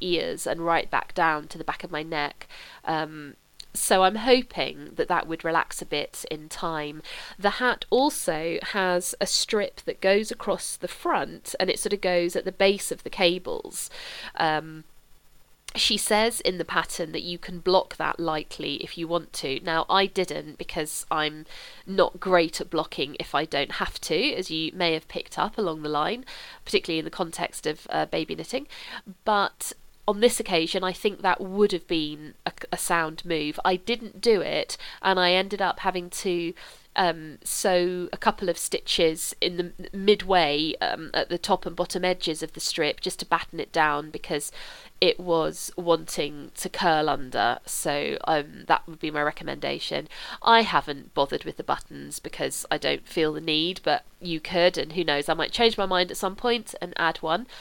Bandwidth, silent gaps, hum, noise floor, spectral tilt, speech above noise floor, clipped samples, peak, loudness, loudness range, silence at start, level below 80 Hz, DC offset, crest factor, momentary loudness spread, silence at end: 19 kHz; none; none; -54 dBFS; -3 dB/octave; 28 dB; under 0.1%; -2 dBFS; -26 LUFS; 3 LU; 0 s; -50 dBFS; under 0.1%; 24 dB; 11 LU; 0 s